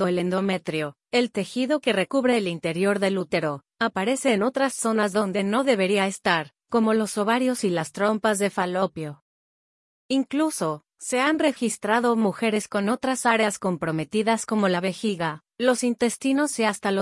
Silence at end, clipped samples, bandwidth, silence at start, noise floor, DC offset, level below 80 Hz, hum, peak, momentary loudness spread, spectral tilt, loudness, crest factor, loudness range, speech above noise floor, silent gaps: 0 s; under 0.1%; 12 kHz; 0 s; under -90 dBFS; under 0.1%; -68 dBFS; none; -6 dBFS; 5 LU; -4.5 dB/octave; -24 LUFS; 18 dB; 3 LU; over 67 dB; 9.22-10.09 s